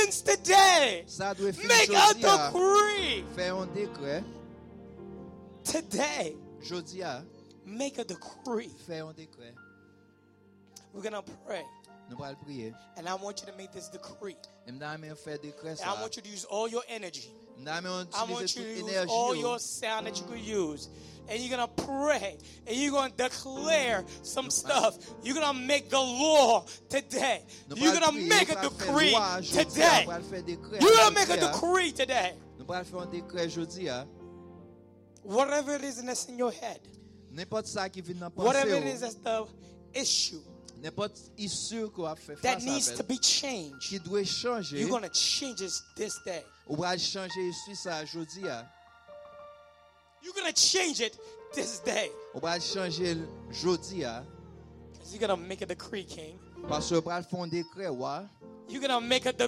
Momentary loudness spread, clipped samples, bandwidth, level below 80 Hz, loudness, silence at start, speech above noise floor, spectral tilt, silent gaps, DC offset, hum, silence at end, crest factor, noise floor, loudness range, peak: 21 LU; under 0.1%; 16 kHz; -64 dBFS; -28 LUFS; 0 s; 31 dB; -2.5 dB/octave; none; under 0.1%; none; 0 s; 22 dB; -61 dBFS; 16 LU; -8 dBFS